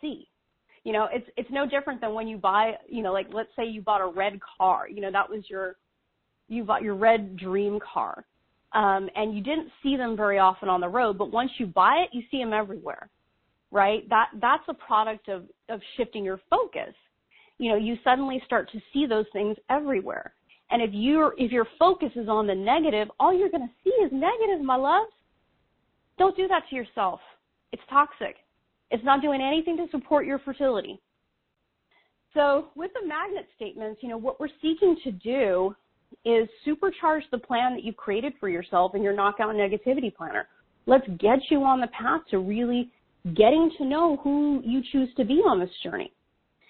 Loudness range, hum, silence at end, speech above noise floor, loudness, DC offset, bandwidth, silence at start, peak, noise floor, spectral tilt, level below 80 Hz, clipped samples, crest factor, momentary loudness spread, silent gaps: 5 LU; none; 0.65 s; 51 dB; -25 LUFS; under 0.1%; 4.5 kHz; 0.05 s; -6 dBFS; -76 dBFS; -3 dB/octave; -58 dBFS; under 0.1%; 20 dB; 12 LU; none